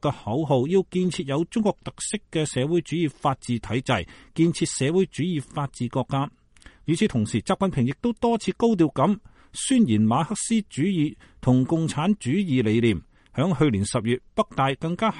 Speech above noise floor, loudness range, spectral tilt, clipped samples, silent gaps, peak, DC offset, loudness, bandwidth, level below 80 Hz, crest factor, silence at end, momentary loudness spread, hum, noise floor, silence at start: 28 dB; 3 LU; -6 dB/octave; under 0.1%; none; -6 dBFS; under 0.1%; -24 LUFS; 11.5 kHz; -52 dBFS; 18 dB; 0 s; 7 LU; none; -51 dBFS; 0.05 s